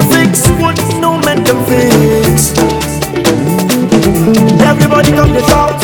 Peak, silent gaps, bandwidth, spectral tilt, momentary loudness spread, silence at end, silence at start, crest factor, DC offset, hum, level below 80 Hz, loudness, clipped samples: 0 dBFS; none; over 20 kHz; -5 dB/octave; 4 LU; 0 s; 0 s; 8 dB; under 0.1%; none; -24 dBFS; -9 LUFS; 0.3%